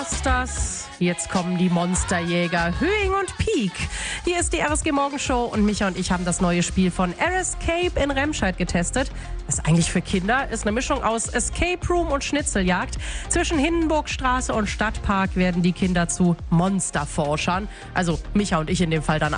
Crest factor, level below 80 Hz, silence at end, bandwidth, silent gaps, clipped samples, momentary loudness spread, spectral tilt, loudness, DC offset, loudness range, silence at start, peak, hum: 16 dB; -32 dBFS; 0 s; 10.5 kHz; none; under 0.1%; 4 LU; -4.5 dB/octave; -22 LUFS; under 0.1%; 1 LU; 0 s; -6 dBFS; none